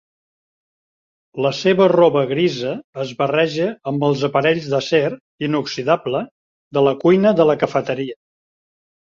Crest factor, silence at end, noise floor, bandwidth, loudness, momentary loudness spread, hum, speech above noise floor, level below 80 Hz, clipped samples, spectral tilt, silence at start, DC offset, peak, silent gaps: 16 dB; 0.9 s; under -90 dBFS; 7.6 kHz; -18 LUFS; 12 LU; none; over 73 dB; -60 dBFS; under 0.1%; -6.5 dB/octave; 1.35 s; under 0.1%; -2 dBFS; 2.84-2.93 s, 5.21-5.38 s, 6.31-6.71 s